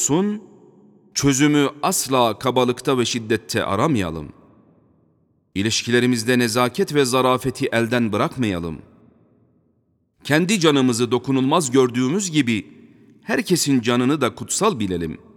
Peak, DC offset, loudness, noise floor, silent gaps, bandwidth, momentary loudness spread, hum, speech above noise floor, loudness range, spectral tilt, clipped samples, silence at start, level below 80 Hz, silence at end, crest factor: -2 dBFS; under 0.1%; -19 LUFS; -65 dBFS; none; 18 kHz; 9 LU; none; 46 dB; 4 LU; -4.5 dB/octave; under 0.1%; 0 s; -52 dBFS; 0.2 s; 18 dB